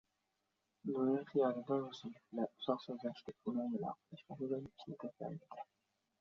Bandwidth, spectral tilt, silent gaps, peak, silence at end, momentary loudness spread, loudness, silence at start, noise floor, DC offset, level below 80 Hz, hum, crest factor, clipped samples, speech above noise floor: 7 kHz; -6 dB/octave; none; -20 dBFS; 0.55 s; 15 LU; -42 LUFS; 0.85 s; -86 dBFS; under 0.1%; -82 dBFS; none; 22 dB; under 0.1%; 45 dB